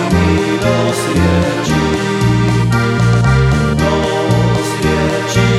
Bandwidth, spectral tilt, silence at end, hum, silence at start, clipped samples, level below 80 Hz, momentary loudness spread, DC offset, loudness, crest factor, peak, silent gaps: 13.5 kHz; -6 dB/octave; 0 s; none; 0 s; under 0.1%; -26 dBFS; 3 LU; under 0.1%; -13 LUFS; 12 dB; 0 dBFS; none